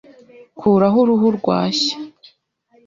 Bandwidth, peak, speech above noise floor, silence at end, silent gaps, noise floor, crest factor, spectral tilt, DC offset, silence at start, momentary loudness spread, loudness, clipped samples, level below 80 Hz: 7.6 kHz; -2 dBFS; 43 dB; 0.8 s; none; -58 dBFS; 16 dB; -6 dB/octave; under 0.1%; 0.55 s; 11 LU; -16 LUFS; under 0.1%; -58 dBFS